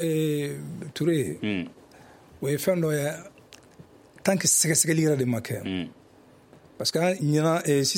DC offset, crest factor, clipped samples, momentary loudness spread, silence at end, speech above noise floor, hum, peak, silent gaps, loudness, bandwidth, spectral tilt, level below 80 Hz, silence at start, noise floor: under 0.1%; 20 dB; under 0.1%; 13 LU; 0 s; 30 dB; none; -6 dBFS; none; -25 LUFS; 16.5 kHz; -4 dB/octave; -64 dBFS; 0 s; -54 dBFS